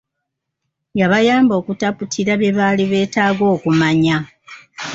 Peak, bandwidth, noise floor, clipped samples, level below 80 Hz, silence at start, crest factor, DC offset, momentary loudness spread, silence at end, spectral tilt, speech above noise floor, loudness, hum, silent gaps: -2 dBFS; 7.8 kHz; -77 dBFS; under 0.1%; -54 dBFS; 0.95 s; 14 dB; under 0.1%; 9 LU; 0 s; -5.5 dB/octave; 62 dB; -16 LUFS; none; none